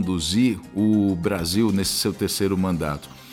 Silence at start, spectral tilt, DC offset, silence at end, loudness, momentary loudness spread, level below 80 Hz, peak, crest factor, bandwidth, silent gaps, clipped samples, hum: 0 s; -5 dB/octave; under 0.1%; 0 s; -22 LUFS; 4 LU; -44 dBFS; -8 dBFS; 14 dB; 17.5 kHz; none; under 0.1%; none